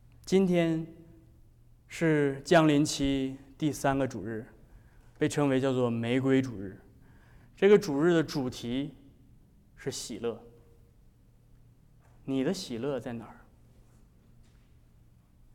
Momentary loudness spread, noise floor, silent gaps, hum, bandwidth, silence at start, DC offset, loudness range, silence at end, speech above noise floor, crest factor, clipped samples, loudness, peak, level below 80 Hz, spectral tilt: 18 LU; -59 dBFS; none; none; 16 kHz; 0.25 s; under 0.1%; 11 LU; 2.2 s; 32 dB; 18 dB; under 0.1%; -29 LUFS; -12 dBFS; -56 dBFS; -6 dB/octave